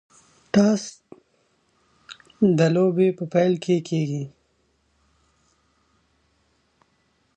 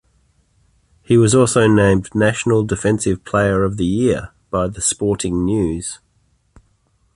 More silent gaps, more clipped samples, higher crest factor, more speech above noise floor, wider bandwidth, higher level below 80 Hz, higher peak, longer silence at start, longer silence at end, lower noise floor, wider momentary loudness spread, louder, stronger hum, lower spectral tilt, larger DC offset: neither; neither; about the same, 20 dB vs 16 dB; about the same, 47 dB vs 45 dB; second, 9.2 kHz vs 11.5 kHz; second, -66 dBFS vs -38 dBFS; second, -6 dBFS vs -2 dBFS; second, 0.55 s vs 1.1 s; first, 3.1 s vs 1.2 s; first, -67 dBFS vs -61 dBFS; first, 19 LU vs 9 LU; second, -21 LUFS vs -17 LUFS; neither; first, -7 dB/octave vs -5.5 dB/octave; neither